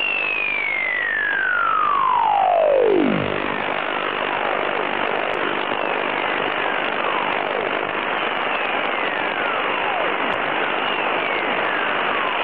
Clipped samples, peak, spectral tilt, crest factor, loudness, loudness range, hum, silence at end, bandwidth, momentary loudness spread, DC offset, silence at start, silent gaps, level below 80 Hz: under 0.1%; -6 dBFS; -7 dB/octave; 14 dB; -20 LUFS; 3 LU; none; 0 s; 5.6 kHz; 5 LU; 0.5%; 0 s; none; -60 dBFS